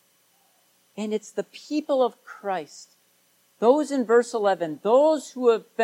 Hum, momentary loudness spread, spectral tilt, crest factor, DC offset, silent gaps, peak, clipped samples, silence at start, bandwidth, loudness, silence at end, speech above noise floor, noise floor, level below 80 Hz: none; 14 LU; -4.5 dB/octave; 18 dB; under 0.1%; none; -6 dBFS; under 0.1%; 0.95 s; 13 kHz; -24 LUFS; 0 s; 41 dB; -64 dBFS; -90 dBFS